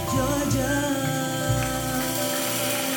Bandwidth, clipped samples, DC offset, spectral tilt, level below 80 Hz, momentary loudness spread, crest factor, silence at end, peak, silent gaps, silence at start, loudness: over 20 kHz; under 0.1%; under 0.1%; -4 dB/octave; -40 dBFS; 2 LU; 14 dB; 0 s; -10 dBFS; none; 0 s; -24 LUFS